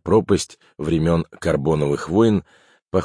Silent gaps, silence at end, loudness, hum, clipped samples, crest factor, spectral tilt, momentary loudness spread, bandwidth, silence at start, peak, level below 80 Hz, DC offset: 2.82-2.86 s; 0 s; -20 LUFS; none; under 0.1%; 16 dB; -6.5 dB/octave; 7 LU; 10.5 kHz; 0.05 s; -4 dBFS; -42 dBFS; under 0.1%